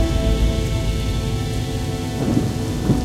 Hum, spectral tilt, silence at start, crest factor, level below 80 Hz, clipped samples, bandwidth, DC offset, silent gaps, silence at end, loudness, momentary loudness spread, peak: none; -6 dB/octave; 0 s; 16 dB; -24 dBFS; under 0.1%; 15.5 kHz; under 0.1%; none; 0 s; -22 LUFS; 4 LU; -4 dBFS